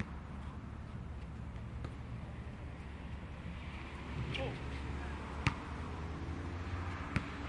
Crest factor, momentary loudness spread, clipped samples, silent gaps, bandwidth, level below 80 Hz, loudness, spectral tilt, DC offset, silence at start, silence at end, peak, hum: 28 dB; 8 LU; under 0.1%; none; 11 kHz; -48 dBFS; -43 LUFS; -6.5 dB/octave; under 0.1%; 0 s; 0 s; -14 dBFS; none